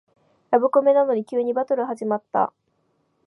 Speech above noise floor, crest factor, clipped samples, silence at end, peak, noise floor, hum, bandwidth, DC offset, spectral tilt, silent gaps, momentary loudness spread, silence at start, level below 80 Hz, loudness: 48 dB; 18 dB; under 0.1%; 0.75 s; -4 dBFS; -69 dBFS; none; 11 kHz; under 0.1%; -7.5 dB/octave; none; 8 LU; 0.5 s; -80 dBFS; -21 LUFS